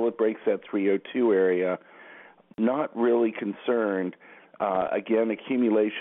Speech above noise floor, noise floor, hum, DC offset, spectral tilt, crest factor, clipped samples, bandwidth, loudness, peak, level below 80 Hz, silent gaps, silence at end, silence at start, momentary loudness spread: 25 dB; -50 dBFS; none; under 0.1%; -10.5 dB/octave; 14 dB; under 0.1%; 3.9 kHz; -26 LUFS; -12 dBFS; -74 dBFS; none; 0 s; 0 s; 8 LU